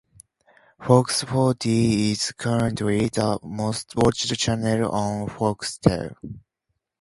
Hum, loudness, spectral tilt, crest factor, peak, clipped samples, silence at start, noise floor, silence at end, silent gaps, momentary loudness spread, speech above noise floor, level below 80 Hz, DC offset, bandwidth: none; -23 LUFS; -5.5 dB/octave; 22 dB; 0 dBFS; under 0.1%; 0.8 s; -78 dBFS; 0.6 s; none; 8 LU; 56 dB; -48 dBFS; under 0.1%; 11.5 kHz